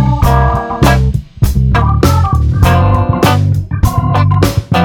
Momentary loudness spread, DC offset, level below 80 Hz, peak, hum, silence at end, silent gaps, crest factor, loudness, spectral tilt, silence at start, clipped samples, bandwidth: 4 LU; under 0.1%; -16 dBFS; 0 dBFS; none; 0 s; none; 10 dB; -11 LUFS; -6.5 dB/octave; 0 s; 0.4%; 17.5 kHz